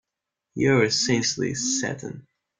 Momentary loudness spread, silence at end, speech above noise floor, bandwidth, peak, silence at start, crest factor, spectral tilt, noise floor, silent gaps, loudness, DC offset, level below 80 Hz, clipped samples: 19 LU; 0.4 s; 61 dB; 10 kHz; -8 dBFS; 0.55 s; 18 dB; -3.5 dB/octave; -85 dBFS; none; -23 LUFS; under 0.1%; -60 dBFS; under 0.1%